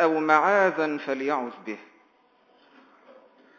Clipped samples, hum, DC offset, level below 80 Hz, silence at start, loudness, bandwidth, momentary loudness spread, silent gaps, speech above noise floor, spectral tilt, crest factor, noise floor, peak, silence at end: under 0.1%; none; under 0.1%; -90 dBFS; 0 s; -23 LUFS; 7.2 kHz; 19 LU; none; 38 dB; -5.5 dB/octave; 22 dB; -62 dBFS; -4 dBFS; 1.75 s